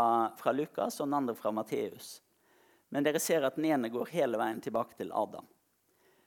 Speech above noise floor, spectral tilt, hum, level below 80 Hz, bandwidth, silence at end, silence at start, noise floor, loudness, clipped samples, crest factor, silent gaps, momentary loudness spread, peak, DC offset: 40 dB; -4.5 dB/octave; none; -82 dBFS; 18.5 kHz; 0.85 s; 0 s; -73 dBFS; -33 LUFS; under 0.1%; 18 dB; none; 10 LU; -14 dBFS; under 0.1%